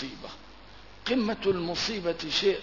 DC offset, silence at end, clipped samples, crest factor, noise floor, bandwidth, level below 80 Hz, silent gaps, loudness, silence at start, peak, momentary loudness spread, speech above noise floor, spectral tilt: 0.2%; 0 s; under 0.1%; 16 dB; -50 dBFS; 6 kHz; -54 dBFS; none; -29 LUFS; 0 s; -14 dBFS; 17 LU; 22 dB; -4 dB/octave